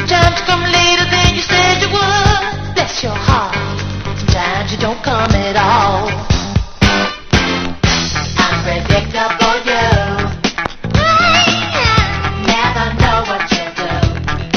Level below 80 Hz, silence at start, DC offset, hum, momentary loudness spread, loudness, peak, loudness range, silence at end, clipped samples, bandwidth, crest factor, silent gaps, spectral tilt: -24 dBFS; 0 s; under 0.1%; none; 8 LU; -13 LUFS; 0 dBFS; 3 LU; 0 s; under 0.1%; 7.4 kHz; 14 dB; none; -4 dB/octave